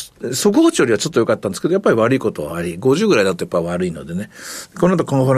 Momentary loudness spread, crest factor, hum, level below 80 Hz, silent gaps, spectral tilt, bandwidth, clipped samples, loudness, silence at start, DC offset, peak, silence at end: 13 LU; 14 dB; none; -50 dBFS; none; -5.5 dB/octave; 15 kHz; under 0.1%; -17 LUFS; 0 s; under 0.1%; -4 dBFS; 0 s